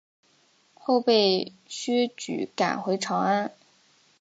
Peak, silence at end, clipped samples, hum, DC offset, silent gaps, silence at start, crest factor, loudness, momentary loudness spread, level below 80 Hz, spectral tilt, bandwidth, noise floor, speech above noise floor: -8 dBFS; 0.7 s; under 0.1%; none; under 0.1%; none; 0.85 s; 18 dB; -26 LUFS; 13 LU; -76 dBFS; -4 dB/octave; 9.2 kHz; -63 dBFS; 38 dB